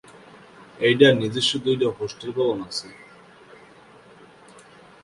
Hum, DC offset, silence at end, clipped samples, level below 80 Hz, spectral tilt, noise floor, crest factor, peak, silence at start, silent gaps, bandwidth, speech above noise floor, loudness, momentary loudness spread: none; under 0.1%; 2.1 s; under 0.1%; -62 dBFS; -5 dB/octave; -49 dBFS; 24 dB; -2 dBFS; 0.8 s; none; 11.5 kHz; 28 dB; -21 LUFS; 15 LU